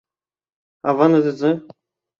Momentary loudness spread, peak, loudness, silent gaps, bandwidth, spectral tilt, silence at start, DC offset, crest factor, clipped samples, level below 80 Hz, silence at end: 11 LU; -2 dBFS; -18 LUFS; none; 7 kHz; -8.5 dB/octave; 0.85 s; under 0.1%; 18 dB; under 0.1%; -68 dBFS; 0.6 s